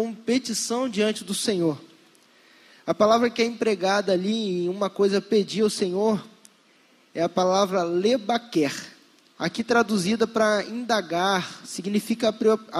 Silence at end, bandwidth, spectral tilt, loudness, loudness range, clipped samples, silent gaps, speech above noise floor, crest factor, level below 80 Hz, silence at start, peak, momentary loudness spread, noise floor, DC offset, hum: 0 s; 14.5 kHz; -4.5 dB/octave; -24 LUFS; 2 LU; under 0.1%; none; 35 dB; 18 dB; -70 dBFS; 0 s; -6 dBFS; 8 LU; -59 dBFS; under 0.1%; none